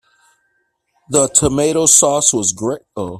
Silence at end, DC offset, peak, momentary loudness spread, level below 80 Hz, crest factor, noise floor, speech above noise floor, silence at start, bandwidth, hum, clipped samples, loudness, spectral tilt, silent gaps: 0 s; under 0.1%; 0 dBFS; 13 LU; -44 dBFS; 16 dB; -66 dBFS; 51 dB; 1.1 s; over 20 kHz; none; under 0.1%; -13 LUFS; -3 dB/octave; none